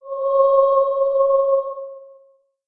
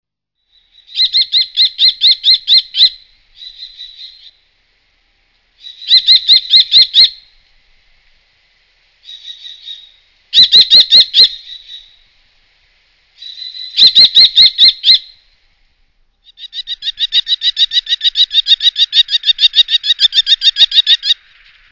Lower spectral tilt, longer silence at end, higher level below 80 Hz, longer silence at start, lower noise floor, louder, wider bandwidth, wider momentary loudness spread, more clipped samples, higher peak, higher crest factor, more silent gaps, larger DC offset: first, -7 dB/octave vs 1.5 dB/octave; about the same, 0.65 s vs 0.6 s; second, -62 dBFS vs -52 dBFS; second, 0.05 s vs 0.95 s; second, -56 dBFS vs -67 dBFS; second, -17 LUFS vs -7 LUFS; second, 4 kHz vs 6 kHz; second, 16 LU vs 24 LU; second, under 0.1% vs 1%; second, -6 dBFS vs 0 dBFS; about the same, 14 dB vs 12 dB; neither; neither